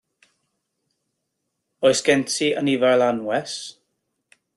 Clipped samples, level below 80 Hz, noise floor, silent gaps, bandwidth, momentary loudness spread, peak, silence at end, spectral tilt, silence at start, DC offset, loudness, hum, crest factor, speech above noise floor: under 0.1%; -68 dBFS; -77 dBFS; none; 12.5 kHz; 13 LU; -4 dBFS; 0.85 s; -3.5 dB/octave; 1.8 s; under 0.1%; -20 LUFS; none; 20 dB; 58 dB